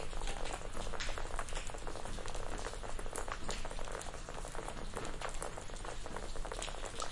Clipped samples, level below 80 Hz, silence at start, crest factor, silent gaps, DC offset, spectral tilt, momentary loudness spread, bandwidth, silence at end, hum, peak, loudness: under 0.1%; -44 dBFS; 0 s; 18 dB; none; under 0.1%; -3 dB/octave; 3 LU; 11.5 kHz; 0 s; none; -22 dBFS; -44 LUFS